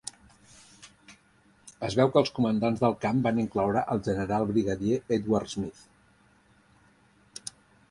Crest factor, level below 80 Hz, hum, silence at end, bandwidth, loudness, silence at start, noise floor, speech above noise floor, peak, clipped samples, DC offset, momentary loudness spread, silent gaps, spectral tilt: 22 dB; -56 dBFS; none; 0.4 s; 11.5 kHz; -27 LUFS; 0.05 s; -62 dBFS; 36 dB; -8 dBFS; under 0.1%; under 0.1%; 17 LU; none; -6.5 dB/octave